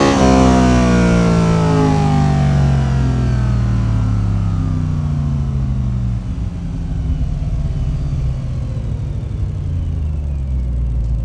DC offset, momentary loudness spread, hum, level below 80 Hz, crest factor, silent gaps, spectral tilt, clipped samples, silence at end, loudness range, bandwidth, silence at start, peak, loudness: under 0.1%; 10 LU; none; -22 dBFS; 14 dB; none; -7.5 dB/octave; under 0.1%; 0 s; 8 LU; 10.5 kHz; 0 s; 0 dBFS; -17 LUFS